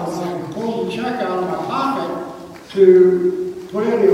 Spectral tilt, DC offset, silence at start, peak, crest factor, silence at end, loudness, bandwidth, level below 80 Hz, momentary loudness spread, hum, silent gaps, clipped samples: -7 dB/octave; under 0.1%; 0 s; 0 dBFS; 18 dB; 0 s; -18 LUFS; 10.5 kHz; -58 dBFS; 15 LU; none; none; under 0.1%